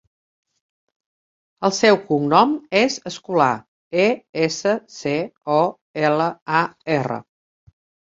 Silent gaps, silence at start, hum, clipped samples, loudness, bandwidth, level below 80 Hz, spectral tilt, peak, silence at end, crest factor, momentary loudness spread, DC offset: 3.68-3.91 s, 4.29-4.33 s, 5.81-5.94 s, 6.42-6.46 s; 1.6 s; none; under 0.1%; -20 LUFS; 7.8 kHz; -64 dBFS; -4.5 dB/octave; -2 dBFS; 0.9 s; 20 dB; 9 LU; under 0.1%